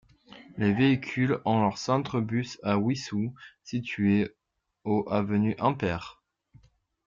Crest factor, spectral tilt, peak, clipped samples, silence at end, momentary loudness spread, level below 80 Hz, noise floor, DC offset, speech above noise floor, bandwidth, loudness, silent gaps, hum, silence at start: 18 dB; -7 dB/octave; -10 dBFS; under 0.1%; 0.95 s; 11 LU; -62 dBFS; -61 dBFS; under 0.1%; 35 dB; 7.6 kHz; -28 LUFS; none; none; 0.3 s